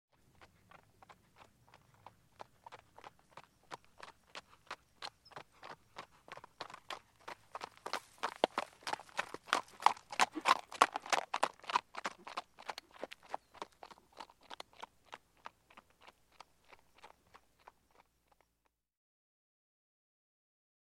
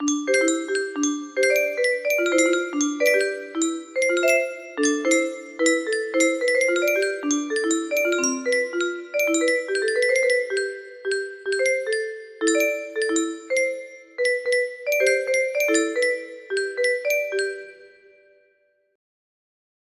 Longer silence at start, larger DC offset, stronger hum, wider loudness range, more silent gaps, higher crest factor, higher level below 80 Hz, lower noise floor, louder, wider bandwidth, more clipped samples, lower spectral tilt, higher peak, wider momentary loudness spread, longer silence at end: first, 0.4 s vs 0 s; neither; neither; first, 23 LU vs 3 LU; neither; first, 36 dB vs 18 dB; second, -80 dBFS vs -72 dBFS; first, -82 dBFS vs -65 dBFS; second, -38 LUFS vs -22 LUFS; first, 16.5 kHz vs 14.5 kHz; neither; about the same, -1 dB/octave vs -0.5 dB/octave; about the same, -6 dBFS vs -6 dBFS; first, 26 LU vs 7 LU; first, 3.75 s vs 2.05 s